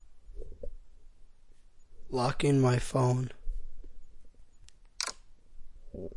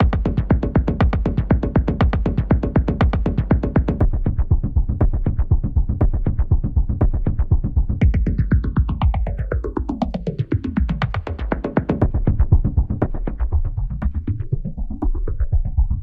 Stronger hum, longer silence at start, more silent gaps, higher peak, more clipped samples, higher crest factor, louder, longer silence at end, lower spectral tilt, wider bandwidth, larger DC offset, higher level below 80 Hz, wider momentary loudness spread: neither; about the same, 0.05 s vs 0 s; neither; second, -12 dBFS vs -4 dBFS; neither; first, 20 dB vs 14 dB; second, -30 LUFS vs -21 LUFS; about the same, 0 s vs 0 s; second, -6 dB/octave vs -10.5 dB/octave; first, 11.5 kHz vs 4.8 kHz; neither; second, -44 dBFS vs -22 dBFS; first, 24 LU vs 7 LU